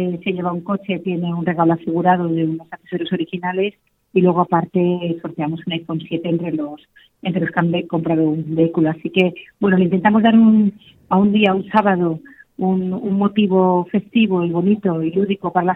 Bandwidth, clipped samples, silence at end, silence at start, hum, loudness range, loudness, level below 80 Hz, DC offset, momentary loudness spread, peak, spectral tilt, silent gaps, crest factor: 4 kHz; under 0.1%; 0 s; 0 s; none; 6 LU; -18 LUFS; -58 dBFS; under 0.1%; 9 LU; 0 dBFS; -9.5 dB/octave; none; 16 dB